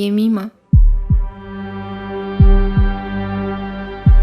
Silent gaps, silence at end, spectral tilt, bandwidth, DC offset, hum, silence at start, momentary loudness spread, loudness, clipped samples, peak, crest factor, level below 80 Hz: none; 0 s; -9 dB/octave; 5 kHz; under 0.1%; none; 0 s; 13 LU; -18 LUFS; under 0.1%; 0 dBFS; 14 dB; -16 dBFS